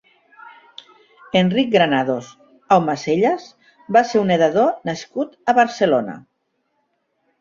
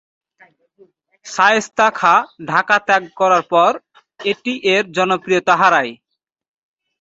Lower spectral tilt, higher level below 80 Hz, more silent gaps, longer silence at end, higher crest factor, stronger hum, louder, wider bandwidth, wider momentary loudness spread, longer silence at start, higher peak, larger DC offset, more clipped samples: first, -6 dB/octave vs -3.5 dB/octave; about the same, -62 dBFS vs -64 dBFS; neither; first, 1.2 s vs 1.05 s; about the same, 18 dB vs 18 dB; neither; second, -18 LUFS vs -15 LUFS; about the same, 7.6 kHz vs 8 kHz; about the same, 11 LU vs 9 LU; second, 0.45 s vs 1.25 s; about the same, -2 dBFS vs 0 dBFS; neither; neither